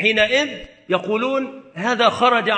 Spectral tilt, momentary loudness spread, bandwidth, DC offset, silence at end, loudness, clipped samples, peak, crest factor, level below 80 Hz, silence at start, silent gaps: -3.5 dB/octave; 11 LU; 9 kHz; under 0.1%; 0 s; -19 LUFS; under 0.1%; -2 dBFS; 18 dB; -54 dBFS; 0 s; none